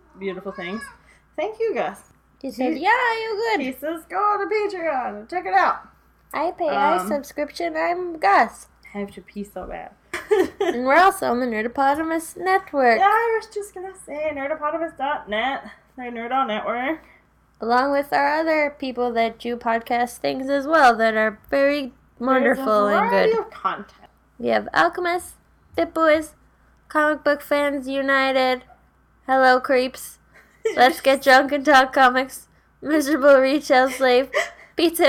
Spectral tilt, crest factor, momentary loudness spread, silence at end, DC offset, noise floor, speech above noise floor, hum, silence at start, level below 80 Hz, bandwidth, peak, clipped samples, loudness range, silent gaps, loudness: -3.5 dB/octave; 16 dB; 17 LU; 0 s; under 0.1%; -57 dBFS; 37 dB; none; 0.2 s; -56 dBFS; 18 kHz; -4 dBFS; under 0.1%; 6 LU; none; -20 LUFS